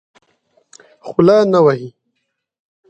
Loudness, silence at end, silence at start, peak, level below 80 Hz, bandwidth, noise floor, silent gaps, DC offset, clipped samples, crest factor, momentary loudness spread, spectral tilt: -13 LUFS; 1 s; 1.05 s; 0 dBFS; -58 dBFS; 8.8 kHz; -72 dBFS; none; under 0.1%; under 0.1%; 16 dB; 23 LU; -7.5 dB/octave